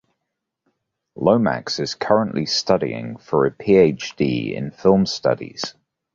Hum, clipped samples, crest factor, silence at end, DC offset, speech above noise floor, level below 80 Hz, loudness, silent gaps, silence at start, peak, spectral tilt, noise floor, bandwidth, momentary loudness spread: none; under 0.1%; 18 dB; 0.45 s; under 0.1%; 60 dB; -52 dBFS; -20 LUFS; none; 1.15 s; -2 dBFS; -5.5 dB/octave; -80 dBFS; 7.6 kHz; 11 LU